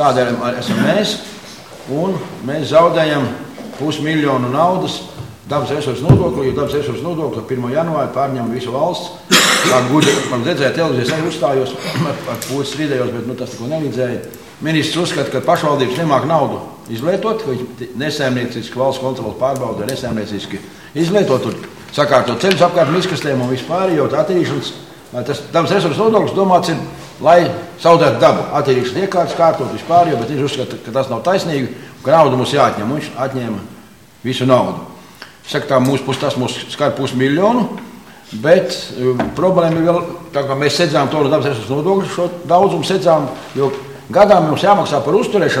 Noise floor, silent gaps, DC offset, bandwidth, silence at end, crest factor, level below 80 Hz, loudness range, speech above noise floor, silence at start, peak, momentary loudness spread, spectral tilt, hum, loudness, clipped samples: -41 dBFS; none; 0.3%; 17 kHz; 0 s; 16 dB; -48 dBFS; 5 LU; 26 dB; 0 s; 0 dBFS; 12 LU; -5 dB/octave; none; -15 LUFS; under 0.1%